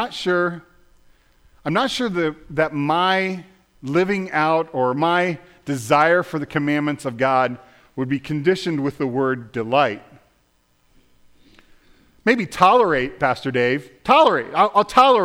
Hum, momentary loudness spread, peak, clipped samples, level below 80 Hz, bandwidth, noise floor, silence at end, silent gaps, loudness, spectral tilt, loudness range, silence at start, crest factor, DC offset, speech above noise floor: none; 11 LU; -2 dBFS; under 0.1%; -54 dBFS; 16 kHz; -62 dBFS; 0 s; none; -19 LUFS; -5.5 dB/octave; 5 LU; 0 s; 18 dB; under 0.1%; 43 dB